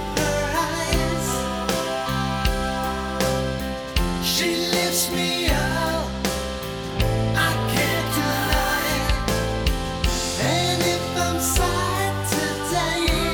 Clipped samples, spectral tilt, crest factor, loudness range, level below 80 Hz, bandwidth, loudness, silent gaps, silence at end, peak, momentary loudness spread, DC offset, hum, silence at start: under 0.1%; -4 dB/octave; 20 dB; 2 LU; -30 dBFS; over 20 kHz; -22 LUFS; none; 0 s; -2 dBFS; 5 LU; under 0.1%; none; 0 s